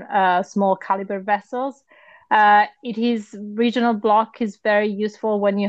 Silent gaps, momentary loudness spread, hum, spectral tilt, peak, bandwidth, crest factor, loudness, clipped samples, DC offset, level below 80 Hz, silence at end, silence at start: none; 10 LU; none; -6 dB/octave; -4 dBFS; 8 kHz; 16 dB; -20 LUFS; under 0.1%; under 0.1%; -72 dBFS; 0 s; 0 s